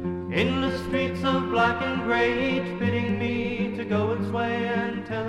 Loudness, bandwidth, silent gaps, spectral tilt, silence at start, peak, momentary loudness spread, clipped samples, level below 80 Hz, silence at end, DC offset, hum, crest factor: -25 LUFS; 12 kHz; none; -7 dB/octave; 0 s; -10 dBFS; 4 LU; under 0.1%; -50 dBFS; 0 s; under 0.1%; none; 16 dB